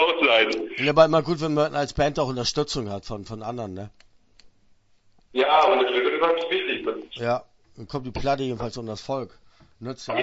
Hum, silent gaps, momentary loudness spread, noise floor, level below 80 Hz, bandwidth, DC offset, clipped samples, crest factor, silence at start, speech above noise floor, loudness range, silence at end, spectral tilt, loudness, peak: none; none; 17 LU; -59 dBFS; -48 dBFS; 8 kHz; under 0.1%; under 0.1%; 22 dB; 0 s; 35 dB; 7 LU; 0 s; -4.5 dB/octave; -23 LUFS; -4 dBFS